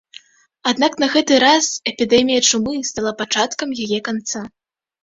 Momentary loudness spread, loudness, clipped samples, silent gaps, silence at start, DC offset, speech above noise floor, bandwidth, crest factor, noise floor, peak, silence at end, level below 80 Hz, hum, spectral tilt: 11 LU; -17 LUFS; under 0.1%; none; 0.65 s; under 0.1%; 28 dB; 8 kHz; 18 dB; -45 dBFS; 0 dBFS; 0.55 s; -56 dBFS; none; -2 dB/octave